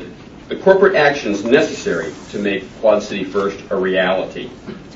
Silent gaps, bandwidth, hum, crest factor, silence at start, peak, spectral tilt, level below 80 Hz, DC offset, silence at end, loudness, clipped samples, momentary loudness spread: none; 7.8 kHz; none; 18 dB; 0 s; 0 dBFS; -5 dB/octave; -48 dBFS; under 0.1%; 0 s; -17 LUFS; under 0.1%; 16 LU